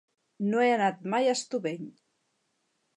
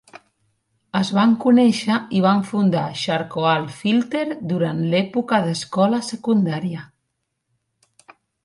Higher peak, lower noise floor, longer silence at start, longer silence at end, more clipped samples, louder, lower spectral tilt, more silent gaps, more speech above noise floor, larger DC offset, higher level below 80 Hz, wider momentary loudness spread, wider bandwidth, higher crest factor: second, -12 dBFS vs -4 dBFS; about the same, -76 dBFS vs -75 dBFS; first, 0.4 s vs 0.15 s; second, 1.05 s vs 1.6 s; neither; second, -28 LUFS vs -20 LUFS; second, -4.5 dB/octave vs -6 dB/octave; neither; second, 49 dB vs 56 dB; neither; second, -84 dBFS vs -64 dBFS; first, 12 LU vs 9 LU; about the same, 11 kHz vs 11.5 kHz; about the same, 18 dB vs 16 dB